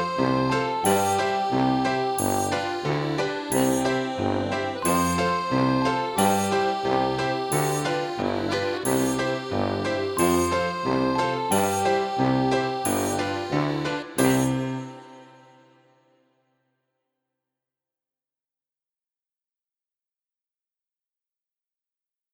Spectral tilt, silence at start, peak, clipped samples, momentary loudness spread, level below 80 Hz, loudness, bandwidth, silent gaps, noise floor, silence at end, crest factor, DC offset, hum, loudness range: -4.5 dB/octave; 0 s; -8 dBFS; under 0.1%; 5 LU; -54 dBFS; -24 LUFS; over 20 kHz; none; under -90 dBFS; 7.1 s; 18 dB; under 0.1%; none; 4 LU